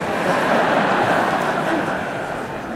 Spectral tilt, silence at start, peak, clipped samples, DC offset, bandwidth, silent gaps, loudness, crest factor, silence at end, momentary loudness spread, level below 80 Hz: -5 dB/octave; 0 s; -4 dBFS; under 0.1%; under 0.1%; 16 kHz; none; -19 LUFS; 16 dB; 0 s; 9 LU; -50 dBFS